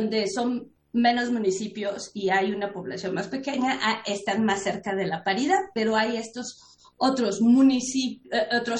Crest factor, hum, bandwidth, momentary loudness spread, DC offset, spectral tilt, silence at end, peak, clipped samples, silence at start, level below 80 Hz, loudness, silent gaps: 16 dB; none; 10 kHz; 10 LU; under 0.1%; -4 dB/octave; 0 s; -10 dBFS; under 0.1%; 0 s; -66 dBFS; -25 LUFS; none